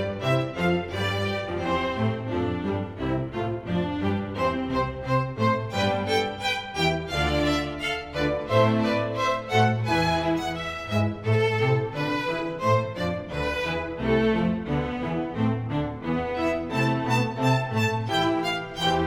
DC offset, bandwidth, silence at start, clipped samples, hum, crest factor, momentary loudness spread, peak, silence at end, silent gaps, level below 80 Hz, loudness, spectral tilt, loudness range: under 0.1%; 16 kHz; 0 s; under 0.1%; none; 18 dB; 6 LU; -8 dBFS; 0 s; none; -44 dBFS; -26 LUFS; -6 dB/octave; 3 LU